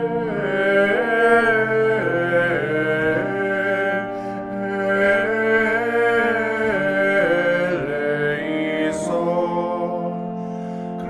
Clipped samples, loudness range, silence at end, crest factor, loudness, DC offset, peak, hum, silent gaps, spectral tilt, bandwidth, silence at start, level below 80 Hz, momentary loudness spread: under 0.1%; 3 LU; 0 s; 16 dB; -20 LUFS; under 0.1%; -4 dBFS; none; none; -6 dB/octave; 12.5 kHz; 0 s; -54 dBFS; 9 LU